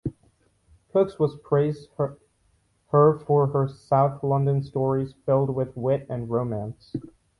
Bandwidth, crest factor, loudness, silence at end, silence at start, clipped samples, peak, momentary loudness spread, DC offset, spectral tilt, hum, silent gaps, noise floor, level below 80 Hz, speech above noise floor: 10.5 kHz; 16 dB; -24 LUFS; 0.35 s; 0.05 s; under 0.1%; -8 dBFS; 11 LU; under 0.1%; -10 dB/octave; none; none; -66 dBFS; -56 dBFS; 43 dB